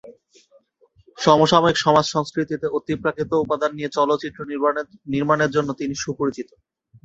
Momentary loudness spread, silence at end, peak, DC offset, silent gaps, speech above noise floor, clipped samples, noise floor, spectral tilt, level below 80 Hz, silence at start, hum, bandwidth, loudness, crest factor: 10 LU; 0.6 s; -2 dBFS; under 0.1%; none; 38 dB; under 0.1%; -59 dBFS; -5 dB/octave; -56 dBFS; 0.05 s; none; 8 kHz; -21 LUFS; 20 dB